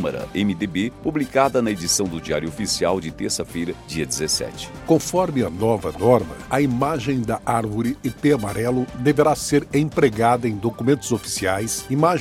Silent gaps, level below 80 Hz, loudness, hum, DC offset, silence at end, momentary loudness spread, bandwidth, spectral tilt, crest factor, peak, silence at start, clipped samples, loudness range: none; -46 dBFS; -21 LUFS; none; under 0.1%; 0 s; 7 LU; 16.5 kHz; -5 dB/octave; 20 dB; -2 dBFS; 0 s; under 0.1%; 3 LU